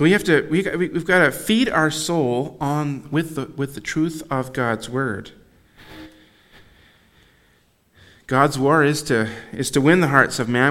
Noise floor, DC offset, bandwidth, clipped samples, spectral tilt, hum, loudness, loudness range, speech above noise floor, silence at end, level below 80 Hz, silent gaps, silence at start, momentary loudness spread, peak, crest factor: -59 dBFS; under 0.1%; 16.5 kHz; under 0.1%; -5 dB/octave; none; -20 LUFS; 10 LU; 40 dB; 0 s; -52 dBFS; none; 0 s; 11 LU; 0 dBFS; 20 dB